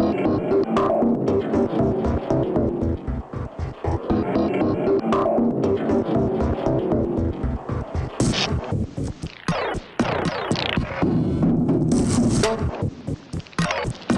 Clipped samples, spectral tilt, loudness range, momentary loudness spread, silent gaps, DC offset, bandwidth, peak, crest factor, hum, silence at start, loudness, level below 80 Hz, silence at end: under 0.1%; -6.5 dB/octave; 3 LU; 9 LU; none; under 0.1%; 11.5 kHz; -4 dBFS; 16 dB; none; 0 s; -23 LUFS; -36 dBFS; 0 s